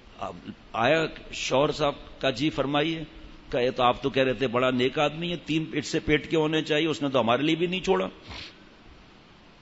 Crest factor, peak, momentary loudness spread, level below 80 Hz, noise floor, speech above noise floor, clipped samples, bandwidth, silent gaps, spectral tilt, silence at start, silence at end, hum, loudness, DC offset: 18 dB; -8 dBFS; 13 LU; -50 dBFS; -53 dBFS; 27 dB; under 0.1%; 8 kHz; none; -5 dB/octave; 0.1 s; 0.7 s; none; -26 LUFS; under 0.1%